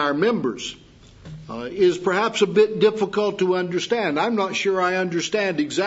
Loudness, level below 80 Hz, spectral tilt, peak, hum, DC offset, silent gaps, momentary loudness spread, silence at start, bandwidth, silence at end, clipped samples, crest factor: -21 LUFS; -58 dBFS; -4.5 dB/octave; -6 dBFS; none; under 0.1%; none; 13 LU; 0 s; 8 kHz; 0 s; under 0.1%; 16 dB